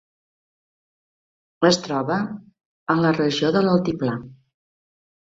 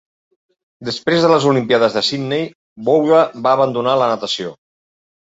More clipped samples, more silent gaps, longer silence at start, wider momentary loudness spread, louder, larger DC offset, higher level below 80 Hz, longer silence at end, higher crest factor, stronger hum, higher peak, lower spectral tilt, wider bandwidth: neither; about the same, 2.65-2.86 s vs 2.55-2.76 s; first, 1.6 s vs 0.8 s; about the same, 13 LU vs 12 LU; second, -21 LUFS vs -16 LUFS; neither; about the same, -58 dBFS vs -60 dBFS; about the same, 0.9 s vs 0.8 s; about the same, 20 dB vs 16 dB; neither; about the same, -4 dBFS vs -2 dBFS; about the same, -5.5 dB/octave vs -5.5 dB/octave; about the same, 7.8 kHz vs 8 kHz